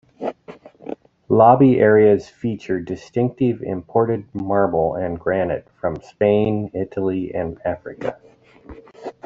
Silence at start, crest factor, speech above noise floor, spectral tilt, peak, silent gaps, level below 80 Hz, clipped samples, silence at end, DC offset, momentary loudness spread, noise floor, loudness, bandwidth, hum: 0.2 s; 18 dB; 25 dB; -9 dB/octave; -2 dBFS; none; -52 dBFS; under 0.1%; 0.15 s; under 0.1%; 17 LU; -43 dBFS; -19 LUFS; 7.2 kHz; none